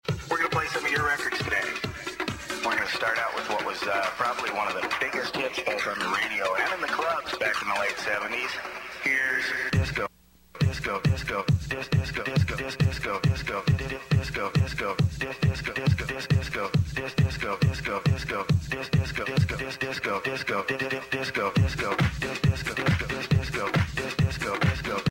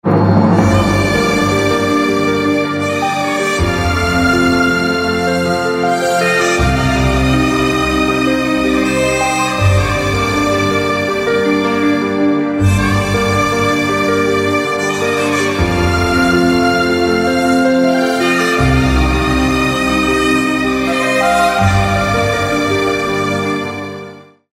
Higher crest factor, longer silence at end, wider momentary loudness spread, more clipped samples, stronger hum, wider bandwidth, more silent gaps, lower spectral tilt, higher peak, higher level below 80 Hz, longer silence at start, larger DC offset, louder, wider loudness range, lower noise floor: about the same, 16 dB vs 12 dB; second, 0 s vs 0.35 s; about the same, 3 LU vs 3 LU; neither; neither; about the same, 16 kHz vs 16 kHz; neither; about the same, -5.5 dB/octave vs -5.5 dB/octave; second, -12 dBFS vs 0 dBFS; second, -42 dBFS vs -28 dBFS; about the same, 0.05 s vs 0.05 s; neither; second, -27 LUFS vs -13 LUFS; about the same, 1 LU vs 1 LU; first, -52 dBFS vs -34 dBFS